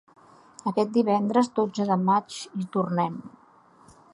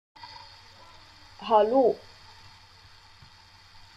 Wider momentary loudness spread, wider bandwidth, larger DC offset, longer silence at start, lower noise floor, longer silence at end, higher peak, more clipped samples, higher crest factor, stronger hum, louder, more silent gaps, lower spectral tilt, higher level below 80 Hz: second, 11 LU vs 28 LU; about the same, 11.5 kHz vs 11 kHz; neither; first, 0.65 s vs 0.25 s; about the same, -55 dBFS vs -54 dBFS; second, 0.85 s vs 2 s; about the same, -8 dBFS vs -8 dBFS; neither; about the same, 18 dB vs 22 dB; neither; about the same, -25 LUFS vs -24 LUFS; neither; about the same, -6.5 dB/octave vs -6 dB/octave; second, -72 dBFS vs -62 dBFS